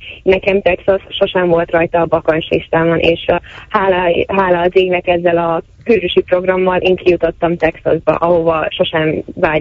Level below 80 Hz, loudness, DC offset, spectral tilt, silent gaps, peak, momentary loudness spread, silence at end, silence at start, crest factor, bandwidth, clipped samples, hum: -38 dBFS; -14 LUFS; under 0.1%; -8 dB/octave; none; 0 dBFS; 4 LU; 0 s; 0 s; 14 dB; 6 kHz; under 0.1%; none